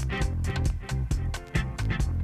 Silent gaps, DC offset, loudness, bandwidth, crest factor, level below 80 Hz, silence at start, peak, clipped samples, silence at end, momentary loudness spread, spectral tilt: none; under 0.1%; -30 LUFS; 13.5 kHz; 14 dB; -30 dBFS; 0 s; -12 dBFS; under 0.1%; 0 s; 2 LU; -6 dB/octave